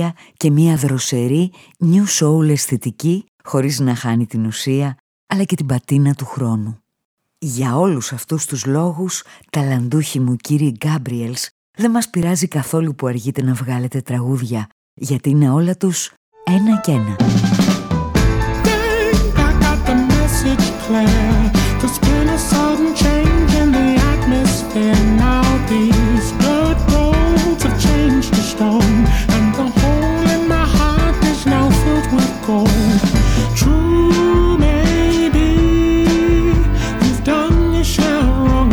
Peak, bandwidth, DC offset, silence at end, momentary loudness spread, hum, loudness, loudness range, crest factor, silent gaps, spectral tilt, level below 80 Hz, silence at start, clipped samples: -2 dBFS; 19 kHz; under 0.1%; 0 s; 7 LU; none; -16 LUFS; 5 LU; 12 dB; 3.28-3.39 s, 5.00-5.27 s, 7.05-7.18 s, 11.51-11.74 s, 14.72-14.97 s, 16.17-16.32 s; -5.5 dB/octave; -22 dBFS; 0 s; under 0.1%